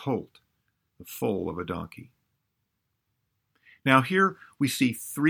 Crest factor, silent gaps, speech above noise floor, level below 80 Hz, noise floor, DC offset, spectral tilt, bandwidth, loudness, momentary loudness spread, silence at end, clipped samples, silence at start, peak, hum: 24 dB; none; 52 dB; -62 dBFS; -79 dBFS; under 0.1%; -5 dB/octave; over 20 kHz; -26 LUFS; 14 LU; 0 s; under 0.1%; 0 s; -4 dBFS; none